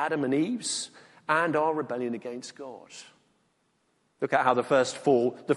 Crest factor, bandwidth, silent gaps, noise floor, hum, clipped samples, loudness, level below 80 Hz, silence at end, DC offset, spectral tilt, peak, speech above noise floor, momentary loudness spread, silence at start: 20 dB; 11.5 kHz; none; -72 dBFS; none; under 0.1%; -27 LUFS; -74 dBFS; 0 s; under 0.1%; -4 dB/octave; -8 dBFS; 44 dB; 18 LU; 0 s